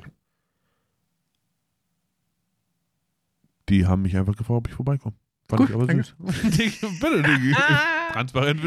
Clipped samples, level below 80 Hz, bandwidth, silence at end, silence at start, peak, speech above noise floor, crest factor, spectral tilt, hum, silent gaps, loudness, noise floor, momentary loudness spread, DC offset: under 0.1%; -46 dBFS; 14 kHz; 0 s; 0.05 s; -6 dBFS; 55 dB; 18 dB; -6 dB/octave; none; none; -22 LUFS; -76 dBFS; 8 LU; under 0.1%